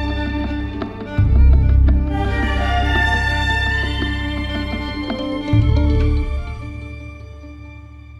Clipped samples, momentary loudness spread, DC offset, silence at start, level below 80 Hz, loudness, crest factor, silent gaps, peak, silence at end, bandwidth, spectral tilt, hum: under 0.1%; 20 LU; under 0.1%; 0 s; -20 dBFS; -18 LUFS; 14 dB; none; -2 dBFS; 0 s; 7.6 kHz; -7 dB/octave; none